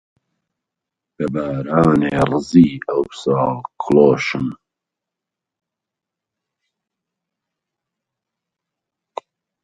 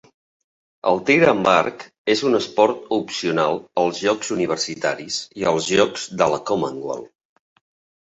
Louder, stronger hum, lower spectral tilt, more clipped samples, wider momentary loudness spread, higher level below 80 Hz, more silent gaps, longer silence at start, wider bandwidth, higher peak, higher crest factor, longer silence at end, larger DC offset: first, -17 LUFS vs -20 LUFS; neither; first, -7.5 dB/octave vs -4 dB/octave; neither; first, 15 LU vs 11 LU; first, -50 dBFS vs -60 dBFS; second, none vs 1.98-2.05 s; first, 1.2 s vs 0.85 s; first, 10.5 kHz vs 8.2 kHz; about the same, 0 dBFS vs -2 dBFS; about the same, 20 dB vs 20 dB; first, 5.1 s vs 0.95 s; neither